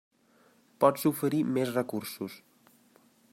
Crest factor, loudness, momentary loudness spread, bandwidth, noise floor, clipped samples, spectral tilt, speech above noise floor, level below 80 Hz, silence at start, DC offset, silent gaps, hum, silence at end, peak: 22 dB; -29 LUFS; 15 LU; 16 kHz; -64 dBFS; under 0.1%; -6 dB/octave; 36 dB; -76 dBFS; 0.8 s; under 0.1%; none; none; 0.95 s; -10 dBFS